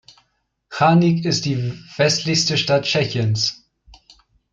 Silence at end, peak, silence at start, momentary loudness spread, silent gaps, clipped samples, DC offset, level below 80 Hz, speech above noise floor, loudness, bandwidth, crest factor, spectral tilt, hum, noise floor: 1 s; -4 dBFS; 0.7 s; 8 LU; none; under 0.1%; under 0.1%; -56 dBFS; 50 dB; -18 LUFS; 7.8 kHz; 16 dB; -4.5 dB/octave; none; -68 dBFS